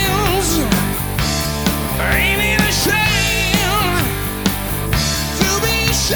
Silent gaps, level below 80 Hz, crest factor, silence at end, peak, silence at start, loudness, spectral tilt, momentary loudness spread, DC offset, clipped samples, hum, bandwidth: none; -26 dBFS; 16 dB; 0 s; 0 dBFS; 0 s; -16 LUFS; -3.5 dB/octave; 5 LU; under 0.1%; under 0.1%; none; over 20 kHz